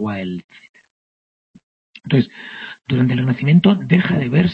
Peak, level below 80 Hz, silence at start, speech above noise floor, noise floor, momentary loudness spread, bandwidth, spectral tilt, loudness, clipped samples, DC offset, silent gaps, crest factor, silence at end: -2 dBFS; -52 dBFS; 0 s; over 73 dB; under -90 dBFS; 18 LU; 5.2 kHz; -9 dB/octave; -17 LUFS; under 0.1%; under 0.1%; 0.44-0.49 s, 0.69-0.74 s, 0.91-1.54 s, 1.63-1.94 s; 16 dB; 0 s